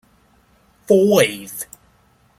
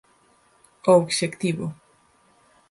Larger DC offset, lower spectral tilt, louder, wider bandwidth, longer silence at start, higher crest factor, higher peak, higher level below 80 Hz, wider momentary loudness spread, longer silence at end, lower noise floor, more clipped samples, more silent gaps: neither; about the same, -4.5 dB/octave vs -5 dB/octave; first, -16 LUFS vs -22 LUFS; first, 16.5 kHz vs 11.5 kHz; about the same, 0.9 s vs 0.85 s; about the same, 20 dB vs 20 dB; first, 0 dBFS vs -4 dBFS; about the same, -60 dBFS vs -64 dBFS; first, 18 LU vs 12 LU; second, 0.75 s vs 0.95 s; second, -56 dBFS vs -60 dBFS; neither; neither